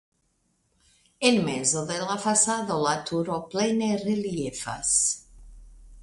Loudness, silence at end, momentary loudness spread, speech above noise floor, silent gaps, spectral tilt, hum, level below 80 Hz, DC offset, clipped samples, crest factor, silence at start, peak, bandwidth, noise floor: -25 LUFS; 0 s; 8 LU; 46 dB; none; -3 dB/octave; none; -54 dBFS; under 0.1%; under 0.1%; 20 dB; 1.2 s; -8 dBFS; 11.5 kHz; -71 dBFS